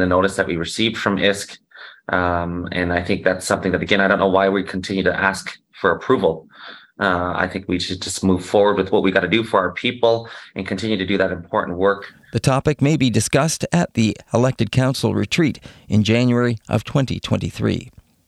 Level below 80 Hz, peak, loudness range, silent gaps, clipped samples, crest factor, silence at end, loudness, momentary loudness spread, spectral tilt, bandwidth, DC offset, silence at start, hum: -50 dBFS; 0 dBFS; 2 LU; none; under 0.1%; 18 dB; 0.4 s; -19 LUFS; 8 LU; -5.5 dB/octave; 13.5 kHz; under 0.1%; 0 s; none